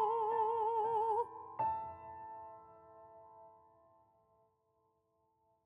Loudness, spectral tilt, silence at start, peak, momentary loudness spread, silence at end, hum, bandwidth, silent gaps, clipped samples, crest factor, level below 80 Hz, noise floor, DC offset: -37 LUFS; -6.5 dB/octave; 0 s; -24 dBFS; 24 LU; 2.15 s; none; 9.2 kHz; none; under 0.1%; 16 dB; -80 dBFS; -79 dBFS; under 0.1%